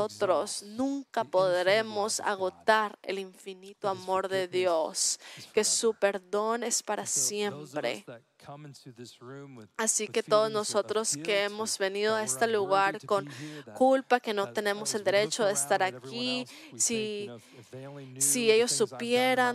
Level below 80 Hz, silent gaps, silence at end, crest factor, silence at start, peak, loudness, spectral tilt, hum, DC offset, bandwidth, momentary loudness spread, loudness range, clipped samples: -80 dBFS; none; 0 s; 20 dB; 0 s; -10 dBFS; -28 LUFS; -2 dB/octave; none; under 0.1%; 15 kHz; 19 LU; 4 LU; under 0.1%